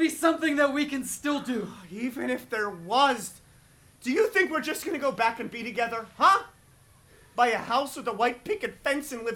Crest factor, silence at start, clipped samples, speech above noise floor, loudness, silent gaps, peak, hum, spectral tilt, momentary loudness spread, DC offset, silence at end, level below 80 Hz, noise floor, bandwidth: 18 dB; 0 s; under 0.1%; 30 dB; -27 LUFS; none; -8 dBFS; none; -3 dB/octave; 10 LU; under 0.1%; 0 s; -64 dBFS; -57 dBFS; 18.5 kHz